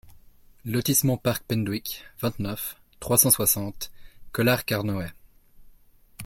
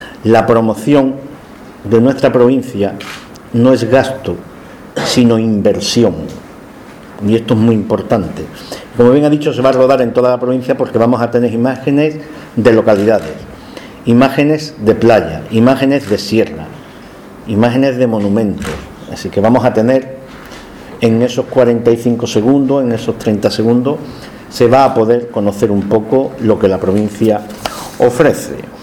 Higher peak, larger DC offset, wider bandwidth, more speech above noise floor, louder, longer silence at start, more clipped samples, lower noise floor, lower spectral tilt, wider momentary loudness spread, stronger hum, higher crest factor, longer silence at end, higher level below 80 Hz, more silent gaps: about the same, -2 dBFS vs 0 dBFS; neither; about the same, 17 kHz vs 17 kHz; first, 30 dB vs 22 dB; second, -24 LUFS vs -12 LUFS; about the same, 0.05 s vs 0 s; second, under 0.1% vs 0.5%; first, -54 dBFS vs -33 dBFS; second, -4 dB/octave vs -6.5 dB/octave; about the same, 17 LU vs 18 LU; neither; first, 24 dB vs 12 dB; about the same, 0 s vs 0 s; second, -52 dBFS vs -42 dBFS; neither